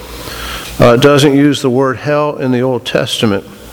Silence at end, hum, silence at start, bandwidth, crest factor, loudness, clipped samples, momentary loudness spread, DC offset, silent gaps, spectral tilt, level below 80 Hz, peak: 0 s; none; 0 s; over 20 kHz; 12 dB; -11 LUFS; 0.4%; 14 LU; under 0.1%; none; -5.5 dB/octave; -36 dBFS; 0 dBFS